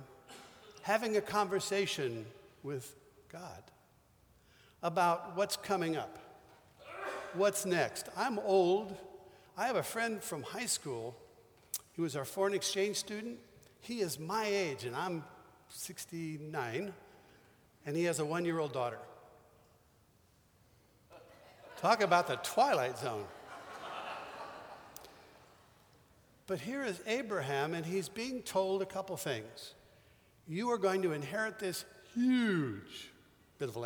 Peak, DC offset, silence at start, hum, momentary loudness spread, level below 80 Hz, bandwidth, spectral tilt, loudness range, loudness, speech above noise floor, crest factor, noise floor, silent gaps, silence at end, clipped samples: -14 dBFS; under 0.1%; 0 s; none; 20 LU; -74 dBFS; over 20 kHz; -4 dB/octave; 8 LU; -36 LUFS; 33 dB; 24 dB; -68 dBFS; none; 0 s; under 0.1%